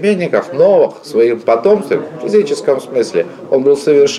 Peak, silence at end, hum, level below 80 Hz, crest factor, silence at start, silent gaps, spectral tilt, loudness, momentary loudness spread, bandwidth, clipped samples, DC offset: -2 dBFS; 0 s; none; -62 dBFS; 10 dB; 0 s; none; -5.5 dB/octave; -13 LUFS; 6 LU; 12 kHz; under 0.1%; under 0.1%